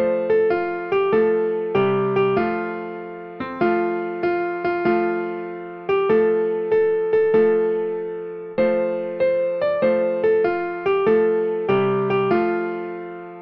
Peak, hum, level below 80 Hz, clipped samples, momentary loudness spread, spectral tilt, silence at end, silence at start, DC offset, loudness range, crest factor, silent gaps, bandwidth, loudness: -6 dBFS; none; -58 dBFS; under 0.1%; 12 LU; -9 dB/octave; 0 s; 0 s; under 0.1%; 3 LU; 14 dB; none; 5.4 kHz; -21 LUFS